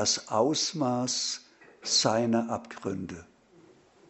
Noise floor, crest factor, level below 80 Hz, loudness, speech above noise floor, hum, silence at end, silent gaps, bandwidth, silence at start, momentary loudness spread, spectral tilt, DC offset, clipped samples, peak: -58 dBFS; 22 dB; -68 dBFS; -28 LUFS; 30 dB; none; 0.85 s; none; 8.2 kHz; 0 s; 14 LU; -3 dB/octave; under 0.1%; under 0.1%; -8 dBFS